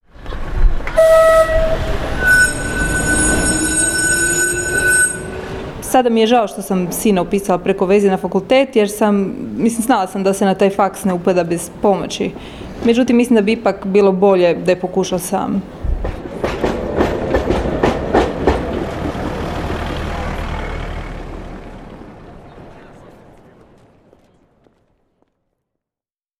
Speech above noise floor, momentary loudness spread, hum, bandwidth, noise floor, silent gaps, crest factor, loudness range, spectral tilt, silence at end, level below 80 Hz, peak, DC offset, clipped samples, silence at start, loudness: over 75 dB; 14 LU; none; 16 kHz; under -90 dBFS; none; 16 dB; 11 LU; -4 dB/octave; 3.5 s; -28 dBFS; -2 dBFS; under 0.1%; under 0.1%; 0.2 s; -15 LUFS